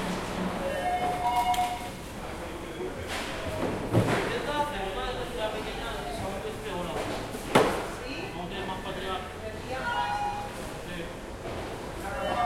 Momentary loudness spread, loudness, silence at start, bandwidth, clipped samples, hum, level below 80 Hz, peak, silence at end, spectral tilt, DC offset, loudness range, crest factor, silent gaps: 11 LU; -31 LUFS; 0 s; 16.5 kHz; under 0.1%; none; -46 dBFS; -6 dBFS; 0 s; -5 dB/octave; under 0.1%; 3 LU; 24 dB; none